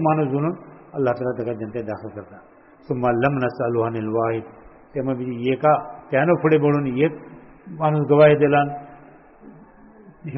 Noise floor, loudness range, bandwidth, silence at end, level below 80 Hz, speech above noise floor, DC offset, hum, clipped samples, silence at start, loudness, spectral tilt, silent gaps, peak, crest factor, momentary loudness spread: -47 dBFS; 6 LU; 5.8 kHz; 0 s; -56 dBFS; 27 dB; under 0.1%; none; under 0.1%; 0 s; -21 LUFS; -7 dB/octave; none; -2 dBFS; 18 dB; 16 LU